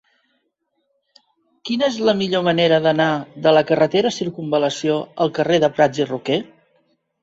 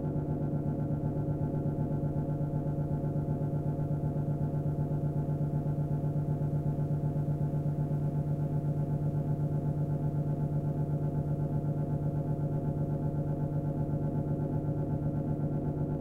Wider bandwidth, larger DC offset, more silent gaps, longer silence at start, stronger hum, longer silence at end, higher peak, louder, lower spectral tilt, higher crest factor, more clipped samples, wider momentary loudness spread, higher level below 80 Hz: first, 8 kHz vs 2.4 kHz; neither; neither; first, 1.65 s vs 0 s; neither; first, 0.8 s vs 0 s; first, -2 dBFS vs -20 dBFS; first, -18 LUFS vs -32 LUFS; second, -5.5 dB/octave vs -11.5 dB/octave; first, 18 dB vs 12 dB; neither; first, 8 LU vs 1 LU; second, -62 dBFS vs -46 dBFS